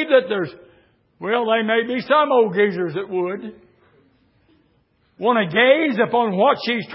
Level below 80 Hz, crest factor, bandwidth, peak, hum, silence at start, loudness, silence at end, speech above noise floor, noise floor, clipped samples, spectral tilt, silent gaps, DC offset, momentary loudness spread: -68 dBFS; 16 dB; 5.8 kHz; -4 dBFS; none; 0 s; -18 LUFS; 0 s; 44 dB; -62 dBFS; under 0.1%; -10 dB/octave; none; under 0.1%; 11 LU